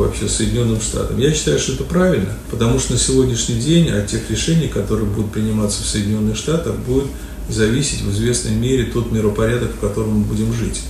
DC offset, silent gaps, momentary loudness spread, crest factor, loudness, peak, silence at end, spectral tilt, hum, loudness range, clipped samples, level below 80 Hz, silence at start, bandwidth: under 0.1%; none; 5 LU; 16 dB; -18 LUFS; -2 dBFS; 0 s; -5 dB/octave; none; 2 LU; under 0.1%; -28 dBFS; 0 s; 14 kHz